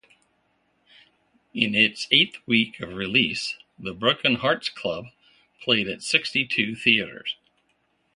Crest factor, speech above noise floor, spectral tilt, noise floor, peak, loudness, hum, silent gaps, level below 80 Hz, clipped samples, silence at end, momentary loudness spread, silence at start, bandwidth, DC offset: 24 dB; 45 dB; -3.5 dB/octave; -69 dBFS; -2 dBFS; -22 LUFS; none; none; -62 dBFS; under 0.1%; 0.8 s; 14 LU; 1.55 s; 11.5 kHz; under 0.1%